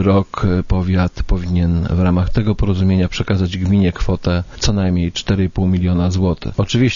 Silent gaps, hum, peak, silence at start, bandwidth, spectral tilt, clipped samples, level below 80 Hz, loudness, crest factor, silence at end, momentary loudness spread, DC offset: none; none; -2 dBFS; 0 s; 7.4 kHz; -7 dB/octave; under 0.1%; -26 dBFS; -17 LUFS; 14 dB; 0 s; 3 LU; under 0.1%